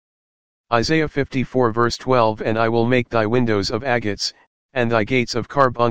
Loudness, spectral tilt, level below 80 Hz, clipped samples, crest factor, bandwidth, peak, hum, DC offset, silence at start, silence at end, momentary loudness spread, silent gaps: -19 LUFS; -5.5 dB/octave; -46 dBFS; under 0.1%; 18 dB; 9.6 kHz; 0 dBFS; none; 2%; 0.65 s; 0 s; 5 LU; 4.47-4.69 s